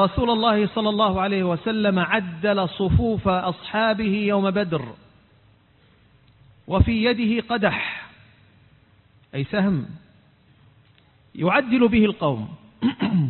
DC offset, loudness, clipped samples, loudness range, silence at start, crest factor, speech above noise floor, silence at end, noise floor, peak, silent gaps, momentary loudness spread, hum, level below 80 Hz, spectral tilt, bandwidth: under 0.1%; -22 LUFS; under 0.1%; 6 LU; 0 s; 18 dB; 36 dB; 0 s; -57 dBFS; -6 dBFS; none; 10 LU; none; -38 dBFS; -11.5 dB/octave; 4.4 kHz